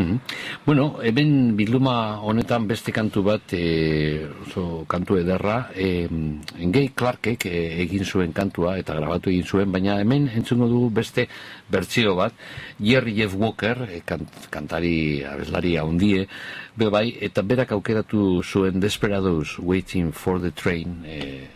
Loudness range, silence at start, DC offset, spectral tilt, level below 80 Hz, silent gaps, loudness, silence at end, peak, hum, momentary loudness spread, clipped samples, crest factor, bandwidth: 3 LU; 0 s; under 0.1%; -6.5 dB/octave; -42 dBFS; none; -23 LUFS; 0.05 s; -6 dBFS; none; 9 LU; under 0.1%; 16 dB; 15 kHz